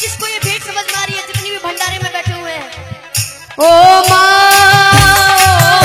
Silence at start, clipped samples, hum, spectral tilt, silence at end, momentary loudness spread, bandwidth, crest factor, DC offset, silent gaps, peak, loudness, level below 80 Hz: 0 s; 1%; none; -2.5 dB/octave; 0 s; 16 LU; over 20 kHz; 10 dB; under 0.1%; none; 0 dBFS; -9 LUFS; -32 dBFS